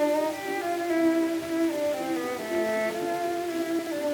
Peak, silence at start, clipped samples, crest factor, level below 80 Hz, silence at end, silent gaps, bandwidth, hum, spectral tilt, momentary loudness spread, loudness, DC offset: -14 dBFS; 0 s; under 0.1%; 14 dB; -68 dBFS; 0 s; none; 19 kHz; none; -4 dB/octave; 5 LU; -28 LUFS; under 0.1%